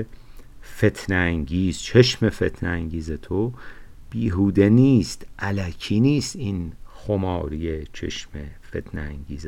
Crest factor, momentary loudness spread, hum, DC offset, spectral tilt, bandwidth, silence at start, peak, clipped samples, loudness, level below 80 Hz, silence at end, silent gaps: 20 dB; 17 LU; none; under 0.1%; -6.5 dB/octave; 14 kHz; 0 s; -2 dBFS; under 0.1%; -22 LUFS; -38 dBFS; 0 s; none